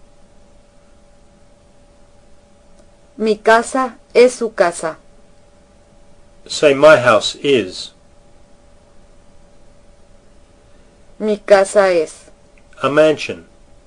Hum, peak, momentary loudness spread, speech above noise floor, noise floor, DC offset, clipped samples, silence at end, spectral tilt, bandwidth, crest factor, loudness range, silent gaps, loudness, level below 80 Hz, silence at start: none; 0 dBFS; 16 LU; 34 dB; -48 dBFS; under 0.1%; 0.2%; 0.45 s; -4 dB/octave; 11.5 kHz; 18 dB; 8 LU; none; -14 LUFS; -50 dBFS; 3.2 s